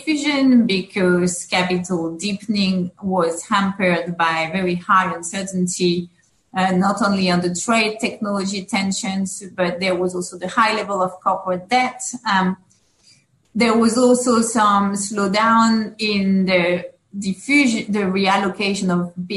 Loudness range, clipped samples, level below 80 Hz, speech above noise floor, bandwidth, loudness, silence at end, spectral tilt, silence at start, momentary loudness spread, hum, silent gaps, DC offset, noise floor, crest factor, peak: 4 LU; under 0.1%; -58 dBFS; 36 dB; 12 kHz; -19 LUFS; 0 s; -4.5 dB/octave; 0 s; 9 LU; none; none; under 0.1%; -55 dBFS; 16 dB; -4 dBFS